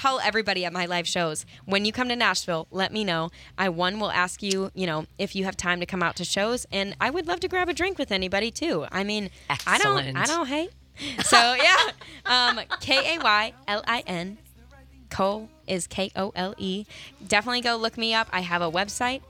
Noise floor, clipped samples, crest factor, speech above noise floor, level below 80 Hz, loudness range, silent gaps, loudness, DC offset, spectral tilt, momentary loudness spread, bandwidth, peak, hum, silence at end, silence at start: -50 dBFS; under 0.1%; 24 dB; 25 dB; -54 dBFS; 6 LU; none; -24 LUFS; under 0.1%; -3 dB/octave; 10 LU; 17 kHz; -2 dBFS; none; 0.05 s; 0 s